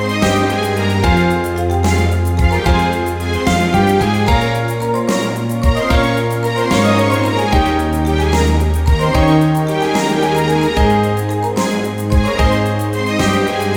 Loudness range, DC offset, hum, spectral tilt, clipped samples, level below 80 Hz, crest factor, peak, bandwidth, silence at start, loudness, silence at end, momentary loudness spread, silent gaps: 1 LU; under 0.1%; none; -6 dB/octave; under 0.1%; -22 dBFS; 12 dB; -2 dBFS; 19.5 kHz; 0 s; -15 LUFS; 0 s; 5 LU; none